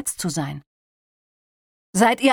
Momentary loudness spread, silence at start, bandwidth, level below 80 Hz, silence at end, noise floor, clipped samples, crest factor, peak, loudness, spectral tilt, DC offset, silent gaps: 15 LU; 0 s; 19.5 kHz; -60 dBFS; 0 s; under -90 dBFS; under 0.1%; 20 dB; -4 dBFS; -22 LUFS; -4 dB/octave; under 0.1%; 0.66-1.93 s